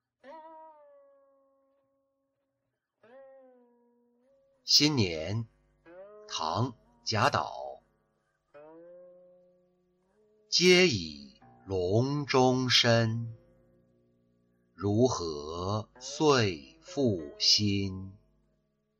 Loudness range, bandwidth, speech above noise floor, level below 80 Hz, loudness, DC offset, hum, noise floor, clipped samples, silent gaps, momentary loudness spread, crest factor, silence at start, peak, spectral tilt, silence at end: 8 LU; 14 kHz; 56 dB; -64 dBFS; -27 LUFS; under 0.1%; none; -83 dBFS; under 0.1%; none; 21 LU; 20 dB; 0.25 s; -12 dBFS; -4 dB/octave; 0.9 s